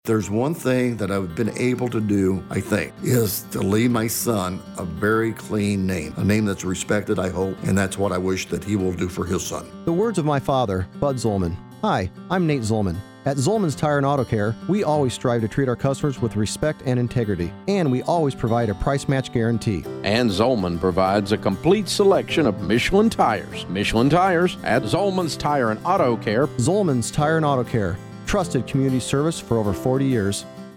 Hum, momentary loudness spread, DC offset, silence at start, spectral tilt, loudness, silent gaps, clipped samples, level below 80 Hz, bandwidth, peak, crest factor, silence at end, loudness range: none; 6 LU; under 0.1%; 0.05 s; -6 dB/octave; -22 LUFS; none; under 0.1%; -44 dBFS; 17.5 kHz; -4 dBFS; 18 dB; 0 s; 4 LU